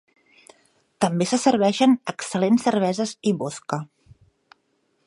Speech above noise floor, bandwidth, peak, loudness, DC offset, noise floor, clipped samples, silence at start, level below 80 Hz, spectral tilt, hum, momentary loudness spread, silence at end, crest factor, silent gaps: 48 dB; 11.5 kHz; -4 dBFS; -22 LUFS; under 0.1%; -69 dBFS; under 0.1%; 1 s; -66 dBFS; -5 dB/octave; none; 11 LU; 1.2 s; 18 dB; none